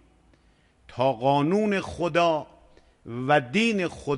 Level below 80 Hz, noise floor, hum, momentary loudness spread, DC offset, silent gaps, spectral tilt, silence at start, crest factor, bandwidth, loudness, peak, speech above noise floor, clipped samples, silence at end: -56 dBFS; -61 dBFS; none; 9 LU; under 0.1%; none; -6 dB/octave; 0.9 s; 18 dB; 11.5 kHz; -24 LUFS; -8 dBFS; 37 dB; under 0.1%; 0 s